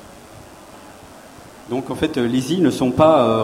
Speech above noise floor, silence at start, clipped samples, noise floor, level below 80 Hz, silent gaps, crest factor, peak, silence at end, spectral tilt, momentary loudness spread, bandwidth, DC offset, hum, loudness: 25 dB; 0.05 s; under 0.1%; -41 dBFS; -50 dBFS; none; 20 dB; 0 dBFS; 0 s; -6 dB/octave; 13 LU; 16 kHz; under 0.1%; none; -18 LUFS